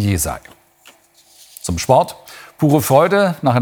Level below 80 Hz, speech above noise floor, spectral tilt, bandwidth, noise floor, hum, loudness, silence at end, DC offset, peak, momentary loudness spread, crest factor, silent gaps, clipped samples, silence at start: -42 dBFS; 35 dB; -5.5 dB/octave; over 20 kHz; -50 dBFS; none; -16 LUFS; 0 s; under 0.1%; 0 dBFS; 18 LU; 18 dB; none; under 0.1%; 0 s